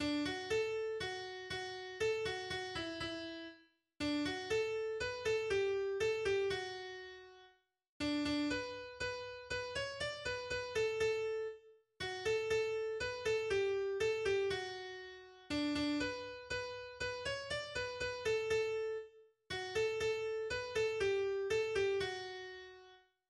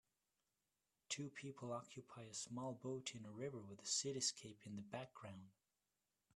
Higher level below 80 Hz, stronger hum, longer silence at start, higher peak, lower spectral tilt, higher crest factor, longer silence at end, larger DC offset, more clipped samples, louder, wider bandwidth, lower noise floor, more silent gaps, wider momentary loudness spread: first, -64 dBFS vs -86 dBFS; second, none vs 50 Hz at -80 dBFS; second, 0 s vs 1.1 s; first, -24 dBFS vs -28 dBFS; about the same, -4 dB/octave vs -3 dB/octave; second, 14 dB vs 24 dB; second, 0.35 s vs 0.85 s; neither; neither; first, -39 LUFS vs -48 LUFS; about the same, 12.5 kHz vs 13 kHz; second, -69 dBFS vs under -90 dBFS; first, 7.89-8.00 s vs none; second, 11 LU vs 14 LU